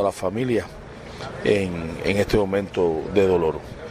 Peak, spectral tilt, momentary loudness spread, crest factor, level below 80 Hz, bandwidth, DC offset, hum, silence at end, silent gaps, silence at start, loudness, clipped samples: -6 dBFS; -6.5 dB/octave; 15 LU; 18 dB; -42 dBFS; 15 kHz; under 0.1%; none; 0 s; none; 0 s; -22 LUFS; under 0.1%